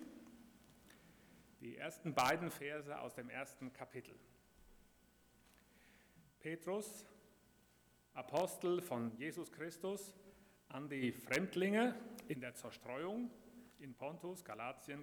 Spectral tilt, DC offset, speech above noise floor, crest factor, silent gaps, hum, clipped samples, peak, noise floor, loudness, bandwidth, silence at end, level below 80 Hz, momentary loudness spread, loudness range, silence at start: -5 dB/octave; under 0.1%; 29 dB; 24 dB; none; none; under 0.1%; -22 dBFS; -72 dBFS; -44 LUFS; over 20 kHz; 0 s; -78 dBFS; 23 LU; 10 LU; 0 s